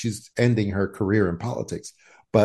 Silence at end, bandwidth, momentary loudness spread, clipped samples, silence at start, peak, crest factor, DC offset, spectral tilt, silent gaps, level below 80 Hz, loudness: 0 s; 12.5 kHz; 12 LU; under 0.1%; 0 s; -4 dBFS; 20 dB; under 0.1%; -7 dB/octave; none; -54 dBFS; -24 LUFS